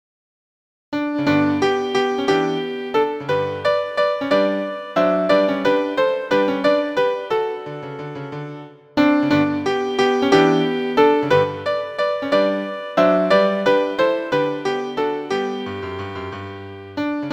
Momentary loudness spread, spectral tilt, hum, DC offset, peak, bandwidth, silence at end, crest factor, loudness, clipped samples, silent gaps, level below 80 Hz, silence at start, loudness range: 14 LU; -6 dB/octave; none; under 0.1%; 0 dBFS; 9.4 kHz; 0 s; 18 dB; -19 LUFS; under 0.1%; none; -58 dBFS; 0.9 s; 4 LU